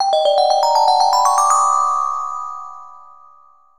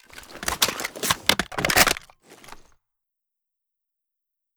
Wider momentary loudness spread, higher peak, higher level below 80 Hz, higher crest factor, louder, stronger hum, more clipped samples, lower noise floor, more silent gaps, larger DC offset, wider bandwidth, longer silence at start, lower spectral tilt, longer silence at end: about the same, 14 LU vs 12 LU; about the same, -2 dBFS vs 0 dBFS; second, -66 dBFS vs -48 dBFS; second, 14 dB vs 28 dB; first, -15 LUFS vs -22 LUFS; neither; neither; second, -50 dBFS vs -83 dBFS; neither; first, 0.8% vs under 0.1%; second, 17 kHz vs over 20 kHz; second, 0 s vs 0.15 s; second, 2 dB/octave vs -1 dB/octave; second, 0.8 s vs 2 s